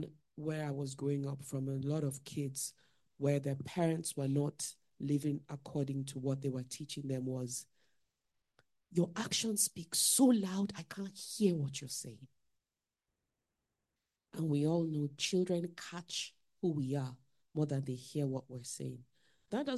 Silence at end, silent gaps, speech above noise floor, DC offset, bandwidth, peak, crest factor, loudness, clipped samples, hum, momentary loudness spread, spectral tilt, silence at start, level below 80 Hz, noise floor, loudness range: 0 s; none; over 54 dB; under 0.1%; 12.5 kHz; -18 dBFS; 20 dB; -37 LUFS; under 0.1%; none; 11 LU; -5 dB/octave; 0 s; -76 dBFS; under -90 dBFS; 8 LU